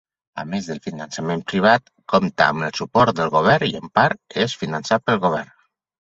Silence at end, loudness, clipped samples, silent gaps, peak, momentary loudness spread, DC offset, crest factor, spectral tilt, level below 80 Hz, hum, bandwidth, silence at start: 0.65 s; -20 LUFS; under 0.1%; none; 0 dBFS; 12 LU; under 0.1%; 20 dB; -5.5 dB/octave; -54 dBFS; none; 8 kHz; 0.35 s